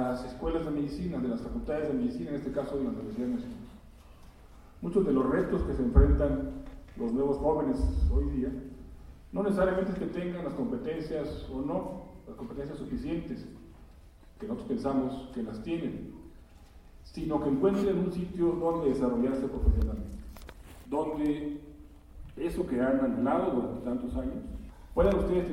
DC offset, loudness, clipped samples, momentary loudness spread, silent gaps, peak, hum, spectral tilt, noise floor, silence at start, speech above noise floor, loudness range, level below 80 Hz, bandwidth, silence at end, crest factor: under 0.1%; -31 LUFS; under 0.1%; 18 LU; none; -8 dBFS; none; -8.5 dB/octave; -53 dBFS; 0 s; 23 dB; 7 LU; -38 dBFS; 13 kHz; 0 s; 24 dB